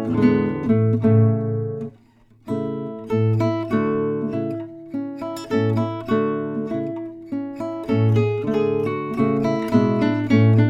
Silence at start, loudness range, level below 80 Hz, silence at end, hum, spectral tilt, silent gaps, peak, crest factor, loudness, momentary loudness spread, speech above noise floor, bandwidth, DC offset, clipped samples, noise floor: 0 s; 4 LU; -54 dBFS; 0 s; none; -9 dB/octave; none; -4 dBFS; 16 dB; -21 LUFS; 12 LU; 36 dB; 7.6 kHz; under 0.1%; under 0.1%; -53 dBFS